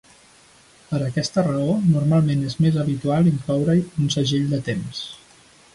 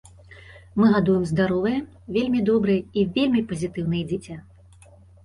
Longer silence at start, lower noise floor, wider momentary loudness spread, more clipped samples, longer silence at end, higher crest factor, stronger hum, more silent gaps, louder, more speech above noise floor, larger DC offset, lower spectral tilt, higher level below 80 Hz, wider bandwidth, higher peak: first, 0.9 s vs 0.3 s; about the same, -52 dBFS vs -50 dBFS; about the same, 9 LU vs 11 LU; neither; second, 0.6 s vs 0.85 s; about the same, 14 dB vs 16 dB; neither; neither; about the same, -21 LUFS vs -23 LUFS; first, 32 dB vs 28 dB; neither; about the same, -6.5 dB/octave vs -7.5 dB/octave; about the same, -52 dBFS vs -50 dBFS; about the same, 11.5 kHz vs 11 kHz; about the same, -8 dBFS vs -8 dBFS